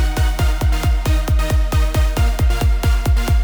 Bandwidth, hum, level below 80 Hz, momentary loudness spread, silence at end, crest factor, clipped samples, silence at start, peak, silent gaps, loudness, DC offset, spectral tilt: over 20 kHz; none; -16 dBFS; 1 LU; 0 s; 8 dB; under 0.1%; 0 s; -6 dBFS; none; -18 LUFS; under 0.1%; -5.5 dB/octave